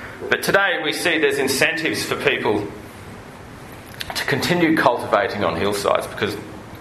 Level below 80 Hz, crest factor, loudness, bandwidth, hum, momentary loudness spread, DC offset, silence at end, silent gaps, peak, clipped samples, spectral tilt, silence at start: -50 dBFS; 20 dB; -19 LUFS; 13.5 kHz; none; 20 LU; under 0.1%; 0 s; none; 0 dBFS; under 0.1%; -4 dB/octave; 0 s